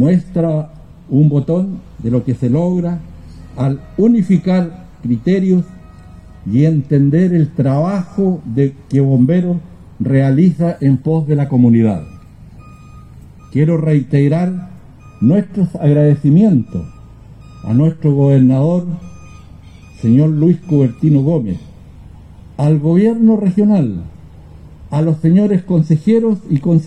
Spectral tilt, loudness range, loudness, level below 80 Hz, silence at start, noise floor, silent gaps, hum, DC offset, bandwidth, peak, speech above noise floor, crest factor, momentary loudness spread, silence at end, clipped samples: -10.5 dB/octave; 3 LU; -14 LUFS; -42 dBFS; 0 s; -37 dBFS; none; none; under 0.1%; 8.6 kHz; -2 dBFS; 25 dB; 12 dB; 12 LU; 0 s; under 0.1%